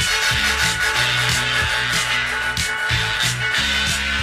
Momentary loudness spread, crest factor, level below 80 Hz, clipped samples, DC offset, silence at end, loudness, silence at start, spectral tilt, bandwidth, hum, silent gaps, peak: 3 LU; 16 dB; -36 dBFS; under 0.1%; under 0.1%; 0 s; -18 LUFS; 0 s; -1.5 dB/octave; 15.5 kHz; none; none; -4 dBFS